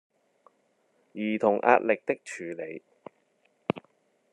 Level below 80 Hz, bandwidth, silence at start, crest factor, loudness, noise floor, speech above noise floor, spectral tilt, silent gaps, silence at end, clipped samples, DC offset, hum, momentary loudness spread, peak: -76 dBFS; 11 kHz; 1.15 s; 24 dB; -28 LUFS; -70 dBFS; 43 dB; -6 dB/octave; none; 0.55 s; under 0.1%; under 0.1%; none; 17 LU; -6 dBFS